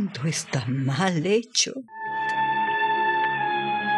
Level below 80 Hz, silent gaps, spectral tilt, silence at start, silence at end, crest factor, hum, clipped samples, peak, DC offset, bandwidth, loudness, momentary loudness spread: -74 dBFS; none; -3.5 dB/octave; 0 s; 0 s; 18 dB; none; under 0.1%; -6 dBFS; under 0.1%; 12.5 kHz; -24 LUFS; 5 LU